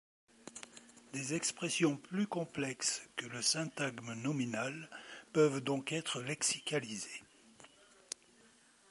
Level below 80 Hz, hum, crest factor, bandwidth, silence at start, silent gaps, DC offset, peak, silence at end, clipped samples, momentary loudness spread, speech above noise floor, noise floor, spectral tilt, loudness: -80 dBFS; none; 22 dB; 11.5 kHz; 0.45 s; none; under 0.1%; -16 dBFS; 1.25 s; under 0.1%; 17 LU; 29 dB; -66 dBFS; -3.5 dB/octave; -36 LUFS